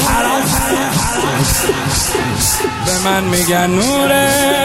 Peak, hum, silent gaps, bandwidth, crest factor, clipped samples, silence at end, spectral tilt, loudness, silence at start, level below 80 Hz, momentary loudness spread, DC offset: -2 dBFS; none; none; 16.5 kHz; 12 dB; under 0.1%; 0 s; -3.5 dB/octave; -13 LUFS; 0 s; -30 dBFS; 3 LU; under 0.1%